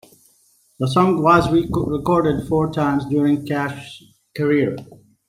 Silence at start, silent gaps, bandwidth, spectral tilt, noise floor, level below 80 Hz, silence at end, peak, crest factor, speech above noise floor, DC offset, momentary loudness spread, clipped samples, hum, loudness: 0.8 s; none; 15.5 kHz; -7.5 dB/octave; -58 dBFS; -46 dBFS; 0.35 s; -2 dBFS; 18 dB; 40 dB; under 0.1%; 12 LU; under 0.1%; none; -19 LUFS